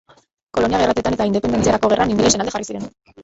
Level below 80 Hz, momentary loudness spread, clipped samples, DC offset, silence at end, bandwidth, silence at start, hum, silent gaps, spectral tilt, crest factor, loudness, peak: -40 dBFS; 12 LU; under 0.1%; under 0.1%; 0 s; 8.2 kHz; 0.55 s; none; none; -4 dB/octave; 16 dB; -18 LUFS; -2 dBFS